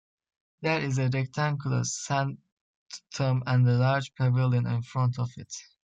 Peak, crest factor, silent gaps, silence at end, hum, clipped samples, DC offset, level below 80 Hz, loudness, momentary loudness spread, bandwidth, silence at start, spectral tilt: -12 dBFS; 16 dB; 2.52-2.86 s; 0.2 s; none; under 0.1%; under 0.1%; -64 dBFS; -27 LUFS; 16 LU; 8 kHz; 0.6 s; -6 dB/octave